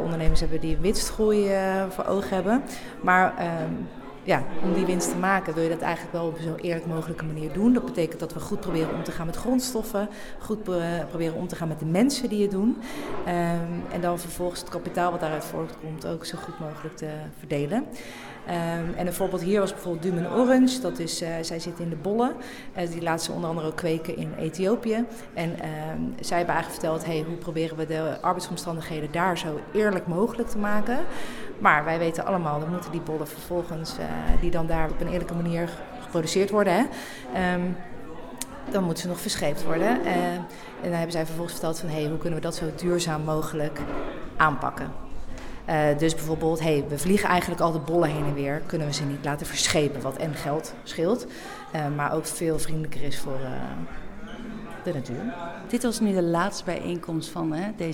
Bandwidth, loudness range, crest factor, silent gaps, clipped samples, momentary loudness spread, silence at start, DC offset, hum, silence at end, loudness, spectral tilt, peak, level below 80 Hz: 18.5 kHz; 5 LU; 24 dB; none; under 0.1%; 12 LU; 0 s; under 0.1%; none; 0 s; -27 LUFS; -5 dB/octave; -2 dBFS; -40 dBFS